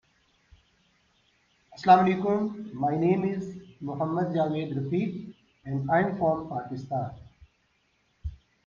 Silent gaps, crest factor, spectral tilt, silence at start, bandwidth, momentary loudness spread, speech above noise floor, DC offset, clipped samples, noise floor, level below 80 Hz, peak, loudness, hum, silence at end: none; 22 dB; -8.5 dB/octave; 1.7 s; 7.2 kHz; 20 LU; 44 dB; under 0.1%; under 0.1%; -70 dBFS; -54 dBFS; -6 dBFS; -27 LUFS; none; 0.3 s